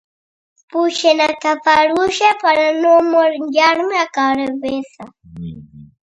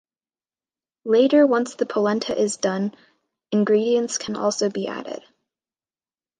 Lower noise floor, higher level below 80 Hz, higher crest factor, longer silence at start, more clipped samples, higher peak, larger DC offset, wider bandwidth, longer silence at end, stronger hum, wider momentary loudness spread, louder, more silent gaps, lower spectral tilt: about the same, under -90 dBFS vs under -90 dBFS; first, -54 dBFS vs -70 dBFS; about the same, 16 dB vs 18 dB; second, 0.75 s vs 1.05 s; neither; first, 0 dBFS vs -6 dBFS; neither; about the same, 10.5 kHz vs 10 kHz; second, 0.3 s vs 1.2 s; neither; about the same, 14 LU vs 13 LU; first, -14 LUFS vs -21 LUFS; neither; about the same, -3.5 dB/octave vs -4.5 dB/octave